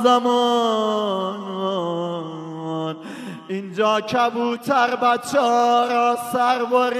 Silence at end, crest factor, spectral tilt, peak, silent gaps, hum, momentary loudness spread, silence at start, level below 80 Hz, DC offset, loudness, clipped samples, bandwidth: 0 s; 16 dB; -4.5 dB/octave; -4 dBFS; none; none; 13 LU; 0 s; -74 dBFS; under 0.1%; -20 LUFS; under 0.1%; 14 kHz